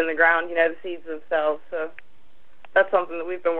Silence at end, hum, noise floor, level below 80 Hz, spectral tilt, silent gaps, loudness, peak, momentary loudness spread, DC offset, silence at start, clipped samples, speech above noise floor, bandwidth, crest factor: 0 s; none; -61 dBFS; -68 dBFS; -6.5 dB/octave; none; -23 LUFS; -6 dBFS; 15 LU; 2%; 0 s; under 0.1%; 38 dB; 4.2 kHz; 18 dB